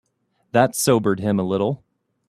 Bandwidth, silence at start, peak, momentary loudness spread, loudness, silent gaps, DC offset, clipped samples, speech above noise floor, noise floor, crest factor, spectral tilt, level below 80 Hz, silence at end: 15.5 kHz; 0.55 s; -2 dBFS; 7 LU; -20 LUFS; none; under 0.1%; under 0.1%; 49 dB; -68 dBFS; 20 dB; -5 dB/octave; -58 dBFS; 0.5 s